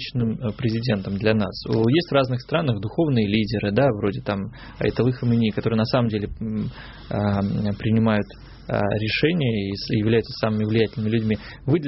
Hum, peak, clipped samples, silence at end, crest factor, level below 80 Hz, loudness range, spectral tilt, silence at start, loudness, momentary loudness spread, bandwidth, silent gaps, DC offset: none; -6 dBFS; under 0.1%; 0 s; 16 dB; -44 dBFS; 2 LU; -6 dB/octave; 0 s; -23 LUFS; 8 LU; 6 kHz; none; under 0.1%